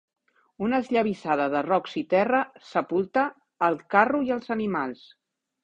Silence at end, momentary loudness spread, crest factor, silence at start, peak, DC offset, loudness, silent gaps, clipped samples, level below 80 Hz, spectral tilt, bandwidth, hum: 0.7 s; 8 LU; 20 dB; 0.6 s; -4 dBFS; under 0.1%; -25 LUFS; none; under 0.1%; -66 dBFS; -7 dB/octave; 8.6 kHz; none